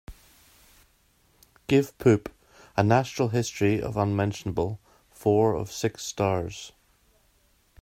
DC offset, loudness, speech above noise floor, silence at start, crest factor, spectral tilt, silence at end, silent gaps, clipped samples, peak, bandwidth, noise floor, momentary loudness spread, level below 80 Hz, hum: under 0.1%; -26 LUFS; 40 dB; 0.1 s; 22 dB; -6 dB/octave; 1.15 s; none; under 0.1%; -6 dBFS; 16 kHz; -64 dBFS; 14 LU; -54 dBFS; none